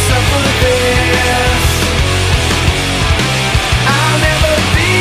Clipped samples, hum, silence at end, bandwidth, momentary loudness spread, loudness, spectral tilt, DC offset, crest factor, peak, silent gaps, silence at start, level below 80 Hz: under 0.1%; none; 0 s; 15.5 kHz; 2 LU; -11 LUFS; -4 dB/octave; under 0.1%; 12 dB; 0 dBFS; none; 0 s; -20 dBFS